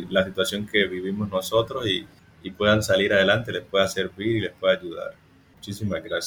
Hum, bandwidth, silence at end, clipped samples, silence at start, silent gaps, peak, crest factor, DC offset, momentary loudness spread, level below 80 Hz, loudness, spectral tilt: none; over 20 kHz; 0 s; under 0.1%; 0 s; none; -6 dBFS; 18 dB; under 0.1%; 16 LU; -54 dBFS; -23 LUFS; -4.5 dB/octave